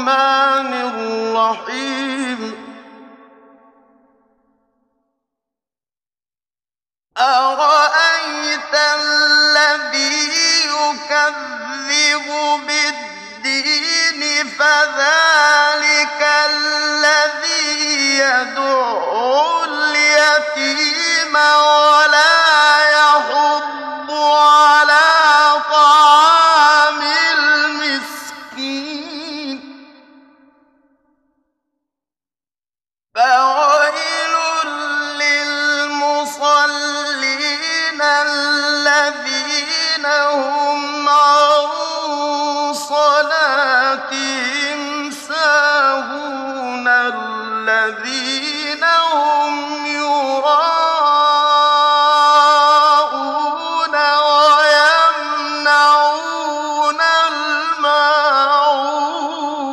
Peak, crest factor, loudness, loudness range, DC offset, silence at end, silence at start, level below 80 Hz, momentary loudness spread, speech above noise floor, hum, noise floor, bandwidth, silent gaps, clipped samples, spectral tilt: 0 dBFS; 14 dB; -13 LUFS; 8 LU; under 0.1%; 0 s; 0 s; -70 dBFS; 12 LU; over 76 dB; none; under -90 dBFS; 13.5 kHz; none; under 0.1%; 0.5 dB/octave